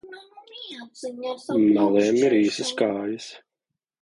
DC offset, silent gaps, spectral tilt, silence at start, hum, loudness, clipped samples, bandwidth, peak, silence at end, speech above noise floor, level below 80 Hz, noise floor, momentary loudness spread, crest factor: under 0.1%; none; -5 dB/octave; 0.05 s; none; -22 LUFS; under 0.1%; 11 kHz; -8 dBFS; 0.65 s; 62 dB; -68 dBFS; -85 dBFS; 20 LU; 16 dB